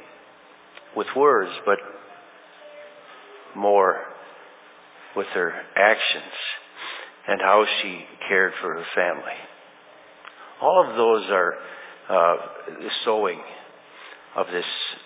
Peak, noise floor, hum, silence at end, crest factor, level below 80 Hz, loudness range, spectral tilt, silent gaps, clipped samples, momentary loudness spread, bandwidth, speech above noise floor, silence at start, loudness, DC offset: -2 dBFS; -50 dBFS; none; 0.05 s; 22 dB; -84 dBFS; 4 LU; -7 dB/octave; none; under 0.1%; 24 LU; 4 kHz; 28 dB; 0 s; -22 LUFS; under 0.1%